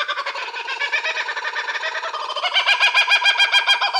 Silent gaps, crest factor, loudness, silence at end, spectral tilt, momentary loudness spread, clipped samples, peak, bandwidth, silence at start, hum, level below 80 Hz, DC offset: none; 14 dB; -18 LUFS; 0 s; 4 dB/octave; 12 LU; under 0.1%; -6 dBFS; 17 kHz; 0 s; none; -88 dBFS; under 0.1%